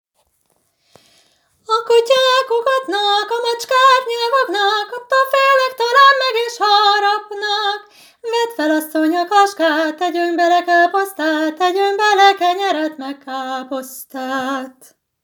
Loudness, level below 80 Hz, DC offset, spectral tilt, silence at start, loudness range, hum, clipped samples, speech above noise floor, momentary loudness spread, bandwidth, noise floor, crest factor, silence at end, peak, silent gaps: -15 LUFS; -78 dBFS; under 0.1%; -0.5 dB/octave; 1.7 s; 4 LU; none; under 0.1%; 47 dB; 13 LU; over 20 kHz; -64 dBFS; 16 dB; 0.55 s; 0 dBFS; none